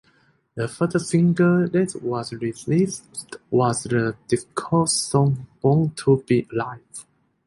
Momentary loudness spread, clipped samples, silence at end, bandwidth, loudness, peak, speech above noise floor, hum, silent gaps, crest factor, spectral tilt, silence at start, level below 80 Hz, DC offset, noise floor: 13 LU; under 0.1%; 0.45 s; 11.5 kHz; -22 LUFS; -4 dBFS; 40 dB; none; none; 18 dB; -6 dB/octave; 0.55 s; -56 dBFS; under 0.1%; -61 dBFS